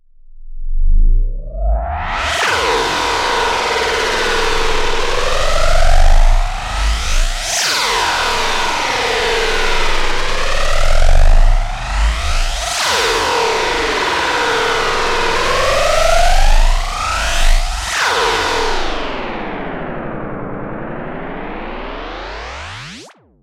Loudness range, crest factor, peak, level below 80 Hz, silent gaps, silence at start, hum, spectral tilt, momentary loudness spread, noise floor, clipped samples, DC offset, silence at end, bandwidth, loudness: 7 LU; 12 dB; -2 dBFS; -16 dBFS; none; 0.3 s; none; -2.5 dB/octave; 12 LU; -38 dBFS; under 0.1%; under 0.1%; 0.35 s; 13.5 kHz; -16 LUFS